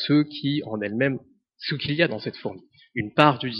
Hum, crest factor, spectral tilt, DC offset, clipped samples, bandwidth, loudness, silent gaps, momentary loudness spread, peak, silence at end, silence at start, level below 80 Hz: none; 24 dB; -4 dB/octave; under 0.1%; under 0.1%; 5.8 kHz; -24 LUFS; none; 16 LU; 0 dBFS; 0 s; 0 s; -62 dBFS